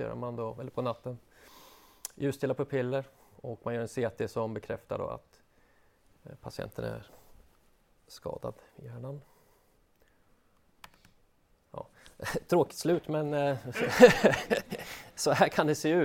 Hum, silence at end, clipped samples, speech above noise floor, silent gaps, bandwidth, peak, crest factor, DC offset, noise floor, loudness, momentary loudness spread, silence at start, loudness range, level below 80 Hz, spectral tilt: none; 0 s; under 0.1%; 37 dB; none; 16.5 kHz; -2 dBFS; 28 dB; under 0.1%; -67 dBFS; -30 LUFS; 20 LU; 0 s; 20 LU; -62 dBFS; -5 dB/octave